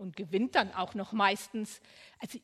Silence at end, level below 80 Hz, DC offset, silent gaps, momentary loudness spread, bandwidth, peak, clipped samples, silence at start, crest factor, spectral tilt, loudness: 0.05 s; -74 dBFS; under 0.1%; none; 16 LU; 14.5 kHz; -10 dBFS; under 0.1%; 0 s; 24 dB; -4 dB/octave; -31 LUFS